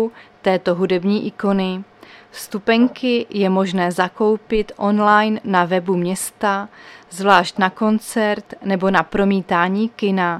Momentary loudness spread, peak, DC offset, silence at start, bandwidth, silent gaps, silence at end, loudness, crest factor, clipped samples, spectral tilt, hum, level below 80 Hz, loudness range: 10 LU; 0 dBFS; under 0.1%; 0 s; 14.5 kHz; none; 0 s; -18 LUFS; 18 dB; under 0.1%; -5.5 dB/octave; none; -48 dBFS; 2 LU